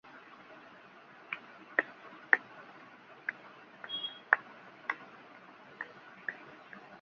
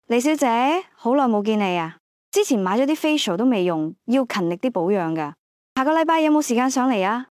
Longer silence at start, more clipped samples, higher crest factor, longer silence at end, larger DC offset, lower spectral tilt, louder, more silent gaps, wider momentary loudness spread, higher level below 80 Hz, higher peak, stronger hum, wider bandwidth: about the same, 0.05 s vs 0.1 s; neither; first, 36 dB vs 14 dB; second, 0 s vs 0.15 s; neither; second, 1.5 dB/octave vs -4.5 dB/octave; second, -35 LUFS vs -21 LUFS; second, none vs 2.00-2.32 s, 5.39-5.76 s; first, 24 LU vs 7 LU; second, -90 dBFS vs -76 dBFS; first, -4 dBFS vs -8 dBFS; neither; second, 7 kHz vs 16 kHz